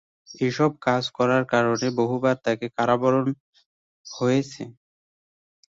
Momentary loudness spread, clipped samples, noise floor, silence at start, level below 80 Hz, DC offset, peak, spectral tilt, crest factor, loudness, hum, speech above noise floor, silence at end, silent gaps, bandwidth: 14 LU; under 0.1%; under -90 dBFS; 0.3 s; -64 dBFS; under 0.1%; -6 dBFS; -6 dB/octave; 18 dB; -23 LUFS; none; over 67 dB; 1.05 s; 3.40-3.53 s, 3.66-4.04 s; 7.8 kHz